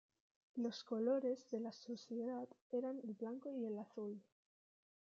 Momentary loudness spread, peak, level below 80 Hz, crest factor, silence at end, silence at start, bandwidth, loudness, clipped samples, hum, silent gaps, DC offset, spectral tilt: 11 LU; -28 dBFS; under -90 dBFS; 16 dB; 0.85 s; 0.55 s; 7.4 kHz; -45 LUFS; under 0.1%; none; 2.61-2.70 s; under 0.1%; -5.5 dB/octave